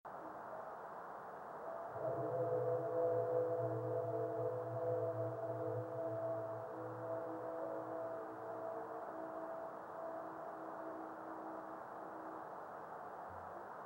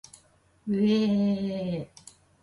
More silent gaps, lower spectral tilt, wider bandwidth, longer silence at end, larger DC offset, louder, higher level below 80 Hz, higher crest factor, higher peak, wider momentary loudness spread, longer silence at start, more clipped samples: neither; first, -9 dB/octave vs -7 dB/octave; first, 16 kHz vs 11.5 kHz; second, 0 s vs 0.55 s; neither; second, -44 LUFS vs -27 LUFS; second, -84 dBFS vs -64 dBFS; about the same, 18 dB vs 14 dB; second, -26 dBFS vs -14 dBFS; second, 12 LU vs 15 LU; second, 0.05 s vs 0.65 s; neither